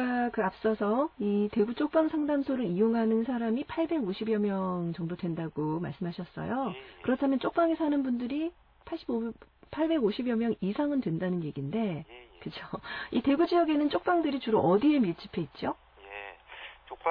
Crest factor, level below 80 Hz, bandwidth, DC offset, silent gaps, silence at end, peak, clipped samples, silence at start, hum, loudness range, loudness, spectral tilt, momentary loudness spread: 16 dB; -62 dBFS; 5.2 kHz; under 0.1%; none; 0 s; -14 dBFS; under 0.1%; 0 s; none; 5 LU; -30 LUFS; -10 dB/octave; 15 LU